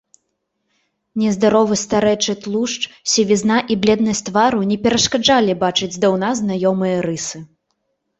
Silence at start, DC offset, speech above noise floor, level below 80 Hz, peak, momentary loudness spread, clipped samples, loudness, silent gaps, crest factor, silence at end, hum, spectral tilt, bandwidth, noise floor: 1.15 s; under 0.1%; 56 dB; -52 dBFS; -2 dBFS; 7 LU; under 0.1%; -17 LUFS; none; 16 dB; 0.75 s; none; -4 dB/octave; 8.4 kHz; -72 dBFS